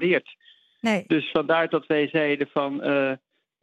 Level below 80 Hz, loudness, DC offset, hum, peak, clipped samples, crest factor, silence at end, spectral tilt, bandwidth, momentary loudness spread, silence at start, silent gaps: -72 dBFS; -24 LUFS; under 0.1%; none; -8 dBFS; under 0.1%; 16 dB; 0.45 s; -6 dB/octave; 11.5 kHz; 4 LU; 0 s; none